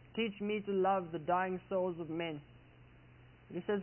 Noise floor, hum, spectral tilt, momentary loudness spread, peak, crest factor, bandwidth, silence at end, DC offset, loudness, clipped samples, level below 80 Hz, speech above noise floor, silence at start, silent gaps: -60 dBFS; none; -3 dB/octave; 10 LU; -20 dBFS; 16 dB; 3.1 kHz; 0 s; under 0.1%; -37 LUFS; under 0.1%; -68 dBFS; 24 dB; 0.05 s; none